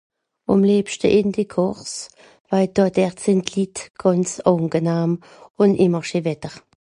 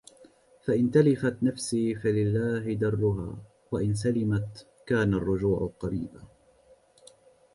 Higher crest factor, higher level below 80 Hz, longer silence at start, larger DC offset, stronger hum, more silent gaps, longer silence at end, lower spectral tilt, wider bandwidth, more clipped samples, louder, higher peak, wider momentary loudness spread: about the same, 18 dB vs 20 dB; about the same, -54 dBFS vs -50 dBFS; second, 0.5 s vs 0.65 s; neither; neither; first, 2.40-2.45 s, 3.90-3.94 s, 5.51-5.55 s vs none; second, 0.25 s vs 1.3 s; about the same, -6 dB/octave vs -7 dB/octave; about the same, 11 kHz vs 11.5 kHz; neither; first, -20 LUFS vs -27 LUFS; first, -2 dBFS vs -8 dBFS; about the same, 13 LU vs 12 LU